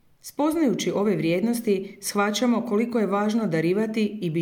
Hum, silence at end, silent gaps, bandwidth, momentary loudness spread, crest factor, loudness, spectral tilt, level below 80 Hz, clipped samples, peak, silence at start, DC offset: none; 0 s; none; 18 kHz; 4 LU; 14 dB; -24 LUFS; -5.5 dB/octave; -68 dBFS; under 0.1%; -10 dBFS; 0.25 s; under 0.1%